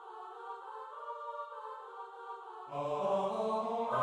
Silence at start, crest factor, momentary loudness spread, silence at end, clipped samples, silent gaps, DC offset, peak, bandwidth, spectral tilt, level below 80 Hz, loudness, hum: 0 s; 18 dB; 13 LU; 0 s; under 0.1%; none; under 0.1%; -22 dBFS; 10.5 kHz; -6 dB/octave; -84 dBFS; -39 LUFS; none